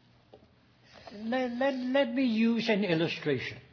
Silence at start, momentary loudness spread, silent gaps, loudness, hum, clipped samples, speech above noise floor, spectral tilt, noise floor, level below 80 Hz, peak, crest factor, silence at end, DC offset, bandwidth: 0.35 s; 7 LU; none; -29 LUFS; none; under 0.1%; 33 dB; -6.5 dB/octave; -62 dBFS; -70 dBFS; -16 dBFS; 16 dB; 0.1 s; under 0.1%; 5.4 kHz